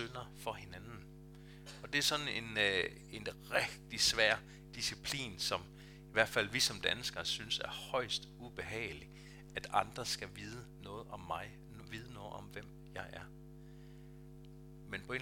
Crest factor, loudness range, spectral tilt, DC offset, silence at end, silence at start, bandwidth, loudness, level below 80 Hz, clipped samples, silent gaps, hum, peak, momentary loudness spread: 28 dB; 14 LU; -2 dB/octave; under 0.1%; 0 s; 0 s; 18 kHz; -37 LUFS; -60 dBFS; under 0.1%; none; 50 Hz at -55 dBFS; -12 dBFS; 23 LU